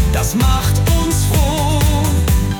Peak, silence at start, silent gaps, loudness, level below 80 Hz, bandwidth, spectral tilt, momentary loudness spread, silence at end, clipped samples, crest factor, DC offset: -2 dBFS; 0 s; none; -15 LUFS; -18 dBFS; 19.5 kHz; -5 dB/octave; 1 LU; 0 s; under 0.1%; 10 dB; under 0.1%